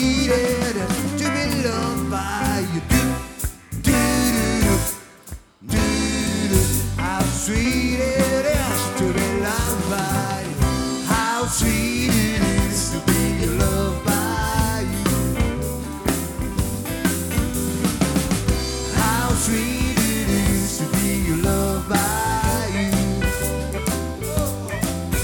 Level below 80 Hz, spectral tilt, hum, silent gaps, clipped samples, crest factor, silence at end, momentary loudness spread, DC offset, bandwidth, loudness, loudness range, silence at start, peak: -30 dBFS; -4.5 dB/octave; none; none; under 0.1%; 18 dB; 0 s; 6 LU; under 0.1%; over 20 kHz; -21 LUFS; 2 LU; 0 s; -2 dBFS